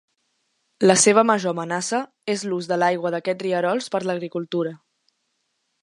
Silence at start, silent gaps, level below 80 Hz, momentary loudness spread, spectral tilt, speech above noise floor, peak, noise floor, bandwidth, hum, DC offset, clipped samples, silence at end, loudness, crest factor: 0.8 s; none; -72 dBFS; 12 LU; -3.5 dB/octave; 52 dB; -2 dBFS; -73 dBFS; 11.5 kHz; none; under 0.1%; under 0.1%; 1.05 s; -21 LUFS; 22 dB